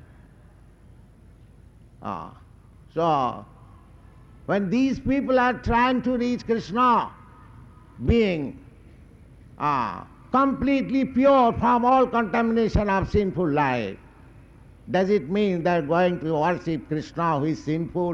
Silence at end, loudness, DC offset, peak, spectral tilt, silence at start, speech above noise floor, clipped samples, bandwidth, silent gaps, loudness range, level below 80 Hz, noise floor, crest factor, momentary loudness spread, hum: 0 s; -23 LUFS; under 0.1%; -8 dBFS; -7.5 dB/octave; 2 s; 28 dB; under 0.1%; 7.6 kHz; none; 10 LU; -42 dBFS; -51 dBFS; 16 dB; 14 LU; none